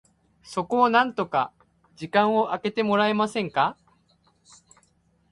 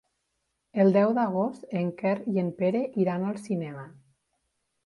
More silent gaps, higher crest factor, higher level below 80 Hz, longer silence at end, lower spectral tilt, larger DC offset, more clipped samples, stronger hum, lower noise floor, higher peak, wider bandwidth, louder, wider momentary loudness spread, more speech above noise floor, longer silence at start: neither; about the same, 22 dB vs 18 dB; first, -66 dBFS vs -72 dBFS; first, 1.6 s vs 0.95 s; second, -5.5 dB/octave vs -8.5 dB/octave; neither; neither; neither; second, -65 dBFS vs -78 dBFS; first, -4 dBFS vs -10 dBFS; about the same, 11.5 kHz vs 11.5 kHz; first, -24 LUFS vs -27 LUFS; about the same, 11 LU vs 10 LU; second, 42 dB vs 52 dB; second, 0.45 s vs 0.75 s